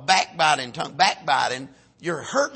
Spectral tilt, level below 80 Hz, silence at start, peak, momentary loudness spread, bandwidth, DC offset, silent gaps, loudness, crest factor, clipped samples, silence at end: -2 dB/octave; -68 dBFS; 0 s; -4 dBFS; 11 LU; 8.8 kHz; under 0.1%; none; -22 LUFS; 20 dB; under 0.1%; 0 s